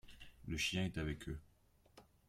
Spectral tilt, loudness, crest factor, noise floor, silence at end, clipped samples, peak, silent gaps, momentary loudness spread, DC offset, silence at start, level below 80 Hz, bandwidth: -4 dB/octave; -42 LUFS; 18 dB; -70 dBFS; 0.25 s; under 0.1%; -28 dBFS; none; 17 LU; under 0.1%; 0.05 s; -58 dBFS; 16 kHz